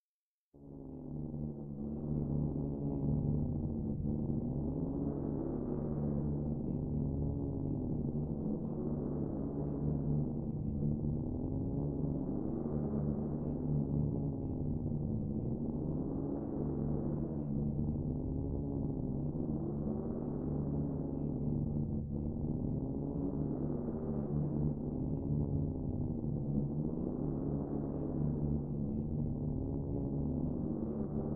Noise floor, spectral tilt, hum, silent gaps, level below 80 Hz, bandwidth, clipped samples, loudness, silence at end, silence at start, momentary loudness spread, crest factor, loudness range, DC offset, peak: under -90 dBFS; -13.5 dB/octave; none; none; -46 dBFS; 1.7 kHz; under 0.1%; -37 LUFS; 0 s; 0.55 s; 3 LU; 14 dB; 1 LU; under 0.1%; -22 dBFS